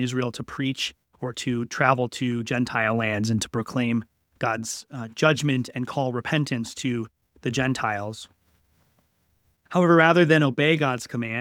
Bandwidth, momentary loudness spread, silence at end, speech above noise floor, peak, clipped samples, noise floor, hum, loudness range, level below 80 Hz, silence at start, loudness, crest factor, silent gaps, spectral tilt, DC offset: 16.5 kHz; 13 LU; 0 s; 44 dB; -2 dBFS; under 0.1%; -68 dBFS; none; 6 LU; -60 dBFS; 0 s; -24 LUFS; 22 dB; none; -5.5 dB/octave; under 0.1%